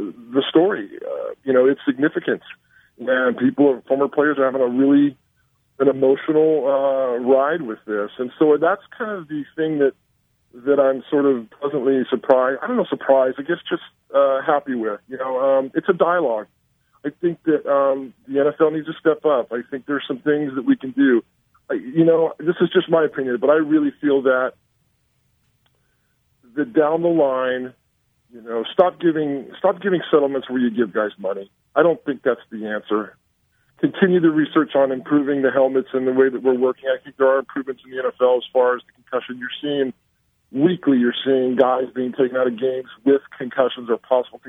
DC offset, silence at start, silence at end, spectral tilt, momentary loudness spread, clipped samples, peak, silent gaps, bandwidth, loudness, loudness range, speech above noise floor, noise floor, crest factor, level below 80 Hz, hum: under 0.1%; 0 s; 0 s; -9 dB/octave; 10 LU; under 0.1%; 0 dBFS; none; 3.9 kHz; -20 LUFS; 4 LU; 47 dB; -66 dBFS; 20 dB; -70 dBFS; none